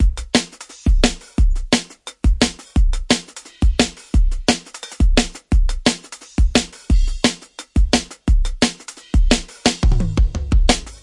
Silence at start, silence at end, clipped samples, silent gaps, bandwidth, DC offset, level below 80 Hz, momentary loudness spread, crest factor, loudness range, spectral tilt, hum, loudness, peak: 0 s; 0.05 s; under 0.1%; none; 11.5 kHz; under 0.1%; -18 dBFS; 6 LU; 16 dB; 1 LU; -4.5 dB/octave; none; -19 LUFS; 0 dBFS